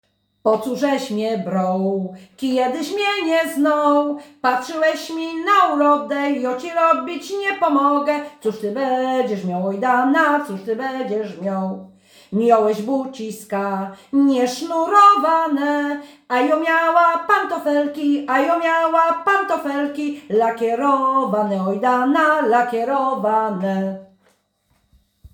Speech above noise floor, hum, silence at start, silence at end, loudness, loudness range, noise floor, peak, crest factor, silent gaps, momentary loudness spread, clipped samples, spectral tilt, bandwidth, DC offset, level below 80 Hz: 46 dB; none; 0.45 s; 0.05 s; -19 LUFS; 4 LU; -65 dBFS; -2 dBFS; 18 dB; none; 9 LU; under 0.1%; -5.5 dB/octave; over 20 kHz; under 0.1%; -66 dBFS